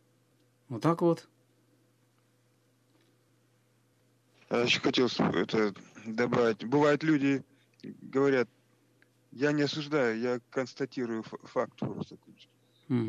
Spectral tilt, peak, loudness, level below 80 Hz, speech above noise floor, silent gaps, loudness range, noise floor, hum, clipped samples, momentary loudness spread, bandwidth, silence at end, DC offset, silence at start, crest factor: -6 dB/octave; -12 dBFS; -30 LUFS; -72 dBFS; 39 dB; none; 7 LU; -69 dBFS; none; under 0.1%; 12 LU; 11 kHz; 0 s; under 0.1%; 0.7 s; 20 dB